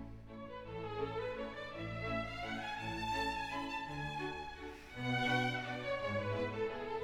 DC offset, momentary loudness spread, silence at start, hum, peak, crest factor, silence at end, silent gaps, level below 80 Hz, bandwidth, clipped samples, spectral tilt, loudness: under 0.1%; 12 LU; 0 s; none; -22 dBFS; 18 dB; 0 s; none; -58 dBFS; 19 kHz; under 0.1%; -5.5 dB/octave; -40 LUFS